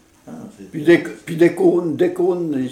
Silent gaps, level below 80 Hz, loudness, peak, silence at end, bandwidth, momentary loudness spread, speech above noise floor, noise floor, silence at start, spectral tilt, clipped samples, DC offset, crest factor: none; -62 dBFS; -17 LUFS; 0 dBFS; 0 s; 13 kHz; 21 LU; 20 dB; -37 dBFS; 0.25 s; -7 dB/octave; under 0.1%; under 0.1%; 16 dB